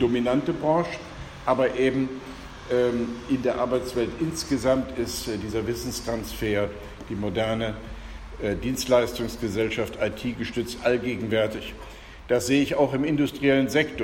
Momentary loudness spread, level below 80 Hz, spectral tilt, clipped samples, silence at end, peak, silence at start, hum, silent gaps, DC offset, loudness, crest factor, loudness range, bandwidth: 14 LU; -44 dBFS; -5 dB/octave; under 0.1%; 0 s; -8 dBFS; 0 s; none; none; under 0.1%; -26 LUFS; 18 dB; 4 LU; 16.5 kHz